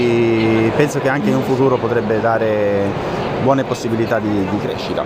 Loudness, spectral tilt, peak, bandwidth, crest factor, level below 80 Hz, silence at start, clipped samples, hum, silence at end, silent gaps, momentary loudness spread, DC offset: -17 LUFS; -6.5 dB/octave; 0 dBFS; 15.5 kHz; 16 dB; -44 dBFS; 0 s; under 0.1%; none; 0 s; none; 5 LU; under 0.1%